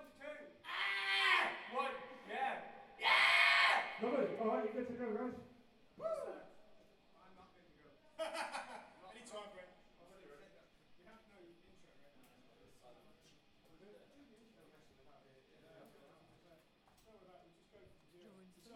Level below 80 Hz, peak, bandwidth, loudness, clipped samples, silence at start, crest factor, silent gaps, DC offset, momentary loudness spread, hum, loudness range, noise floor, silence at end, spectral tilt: -80 dBFS; -18 dBFS; 16 kHz; -36 LUFS; under 0.1%; 0 s; 24 dB; none; under 0.1%; 25 LU; none; 19 LU; -70 dBFS; 0 s; -2.5 dB/octave